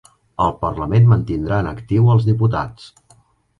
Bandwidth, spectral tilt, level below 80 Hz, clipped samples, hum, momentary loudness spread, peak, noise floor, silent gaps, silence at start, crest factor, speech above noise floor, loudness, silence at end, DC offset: 7 kHz; -9.5 dB/octave; -38 dBFS; under 0.1%; none; 10 LU; -2 dBFS; -54 dBFS; none; 0.4 s; 16 dB; 38 dB; -17 LUFS; 0.75 s; under 0.1%